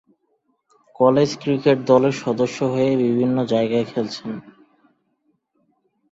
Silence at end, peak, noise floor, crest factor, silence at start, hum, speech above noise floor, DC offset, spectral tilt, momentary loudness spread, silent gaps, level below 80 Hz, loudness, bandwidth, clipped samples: 1.6 s; -2 dBFS; -68 dBFS; 18 dB; 1 s; none; 49 dB; under 0.1%; -6.5 dB/octave; 10 LU; none; -62 dBFS; -19 LUFS; 8 kHz; under 0.1%